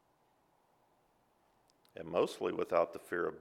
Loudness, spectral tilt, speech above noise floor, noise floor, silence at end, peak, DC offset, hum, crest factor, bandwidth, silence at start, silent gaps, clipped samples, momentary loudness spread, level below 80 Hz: -36 LUFS; -5.5 dB/octave; 38 dB; -73 dBFS; 0 s; -16 dBFS; under 0.1%; none; 22 dB; 16 kHz; 1.95 s; none; under 0.1%; 12 LU; -76 dBFS